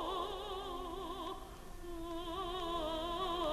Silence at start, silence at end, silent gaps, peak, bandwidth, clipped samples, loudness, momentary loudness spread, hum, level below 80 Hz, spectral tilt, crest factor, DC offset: 0 s; 0 s; none; -26 dBFS; 13.5 kHz; under 0.1%; -42 LUFS; 11 LU; none; -52 dBFS; -4.5 dB/octave; 14 dB; under 0.1%